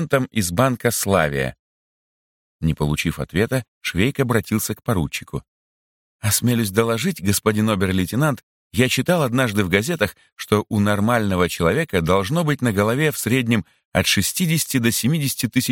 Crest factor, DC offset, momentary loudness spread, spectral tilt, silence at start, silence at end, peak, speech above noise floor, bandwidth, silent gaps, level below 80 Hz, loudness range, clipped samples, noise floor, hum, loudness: 18 dB; under 0.1%; 6 LU; -4.5 dB/octave; 0 s; 0 s; -2 dBFS; over 70 dB; 17 kHz; 1.59-2.59 s, 3.68-3.81 s, 5.48-6.19 s, 8.43-8.71 s, 10.32-10.36 s, 13.85-13.92 s; -44 dBFS; 4 LU; under 0.1%; under -90 dBFS; none; -20 LUFS